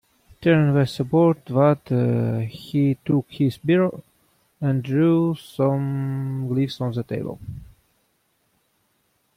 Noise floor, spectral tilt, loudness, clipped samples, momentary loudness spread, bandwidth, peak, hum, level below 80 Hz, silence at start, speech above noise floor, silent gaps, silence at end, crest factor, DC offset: -68 dBFS; -8.5 dB/octave; -22 LUFS; under 0.1%; 10 LU; 15 kHz; -6 dBFS; none; -56 dBFS; 0.4 s; 47 dB; none; 1.75 s; 16 dB; under 0.1%